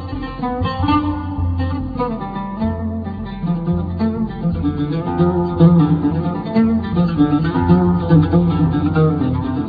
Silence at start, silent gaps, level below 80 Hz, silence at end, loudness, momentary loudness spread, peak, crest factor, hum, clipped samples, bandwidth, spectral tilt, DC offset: 0 s; none; -34 dBFS; 0 s; -17 LUFS; 10 LU; 0 dBFS; 16 dB; none; under 0.1%; 4.9 kHz; -11.5 dB/octave; under 0.1%